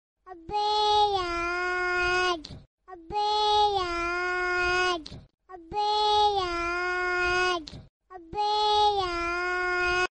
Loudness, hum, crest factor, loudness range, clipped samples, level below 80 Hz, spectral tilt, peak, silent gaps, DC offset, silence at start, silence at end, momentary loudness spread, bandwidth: -26 LUFS; none; 14 dB; 1 LU; under 0.1%; -48 dBFS; -3 dB/octave; -14 dBFS; 2.67-2.78 s, 7.89-8.00 s; under 0.1%; 0.25 s; 0.05 s; 11 LU; 9 kHz